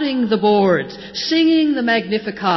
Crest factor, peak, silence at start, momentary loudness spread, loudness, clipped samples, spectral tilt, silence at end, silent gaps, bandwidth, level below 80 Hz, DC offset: 12 dB; -4 dBFS; 0 s; 8 LU; -17 LUFS; under 0.1%; -5.5 dB/octave; 0 s; none; 6.2 kHz; -56 dBFS; under 0.1%